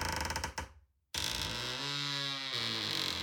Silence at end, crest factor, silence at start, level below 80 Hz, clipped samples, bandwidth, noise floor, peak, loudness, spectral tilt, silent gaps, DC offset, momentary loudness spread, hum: 0 s; 20 dB; 0 s; -52 dBFS; under 0.1%; 17.5 kHz; -59 dBFS; -18 dBFS; -35 LUFS; -2 dB/octave; none; under 0.1%; 8 LU; none